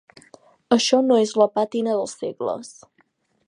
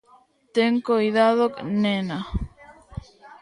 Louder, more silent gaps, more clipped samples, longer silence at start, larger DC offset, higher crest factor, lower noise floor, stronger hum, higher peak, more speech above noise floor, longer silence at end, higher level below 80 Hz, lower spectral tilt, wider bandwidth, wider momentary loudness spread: about the same, -21 LUFS vs -22 LUFS; neither; neither; first, 0.7 s vs 0.55 s; neither; about the same, 20 dB vs 18 dB; first, -64 dBFS vs -57 dBFS; neither; first, -2 dBFS vs -6 dBFS; first, 44 dB vs 36 dB; first, 0.75 s vs 0.1 s; second, -72 dBFS vs -40 dBFS; second, -4 dB/octave vs -7 dB/octave; about the same, 11 kHz vs 10.5 kHz; second, 12 LU vs 21 LU